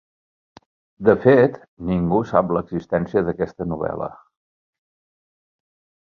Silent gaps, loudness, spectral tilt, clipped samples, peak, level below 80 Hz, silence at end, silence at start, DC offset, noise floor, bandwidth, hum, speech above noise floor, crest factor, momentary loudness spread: 1.68-1.77 s; -20 LUFS; -9.5 dB/octave; under 0.1%; 0 dBFS; -48 dBFS; 2 s; 1 s; under 0.1%; under -90 dBFS; 6.8 kHz; none; over 71 dB; 22 dB; 12 LU